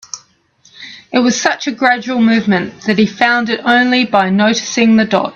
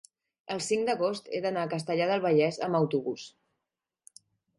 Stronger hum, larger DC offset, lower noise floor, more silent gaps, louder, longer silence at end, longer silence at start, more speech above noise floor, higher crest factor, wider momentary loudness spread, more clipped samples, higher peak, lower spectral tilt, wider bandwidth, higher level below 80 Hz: neither; neither; second, -51 dBFS vs -87 dBFS; neither; first, -12 LUFS vs -29 LUFS; second, 0.05 s vs 1.3 s; second, 0.15 s vs 0.5 s; second, 39 dB vs 59 dB; about the same, 14 dB vs 18 dB; second, 7 LU vs 12 LU; neither; first, 0 dBFS vs -14 dBFS; about the same, -4 dB/octave vs -5 dB/octave; second, 7.4 kHz vs 11.5 kHz; first, -56 dBFS vs -76 dBFS